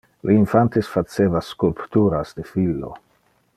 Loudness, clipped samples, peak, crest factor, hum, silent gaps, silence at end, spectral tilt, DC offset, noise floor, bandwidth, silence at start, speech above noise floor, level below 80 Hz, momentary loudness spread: -20 LUFS; under 0.1%; -2 dBFS; 18 dB; none; none; 0.6 s; -8.5 dB/octave; under 0.1%; -62 dBFS; 13.5 kHz; 0.25 s; 43 dB; -48 dBFS; 10 LU